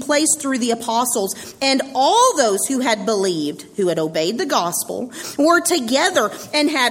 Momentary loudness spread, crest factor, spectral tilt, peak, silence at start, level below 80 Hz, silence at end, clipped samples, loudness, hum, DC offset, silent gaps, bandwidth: 8 LU; 16 dB; -2.5 dB/octave; -2 dBFS; 0 s; -62 dBFS; 0 s; under 0.1%; -18 LUFS; none; under 0.1%; none; 16.5 kHz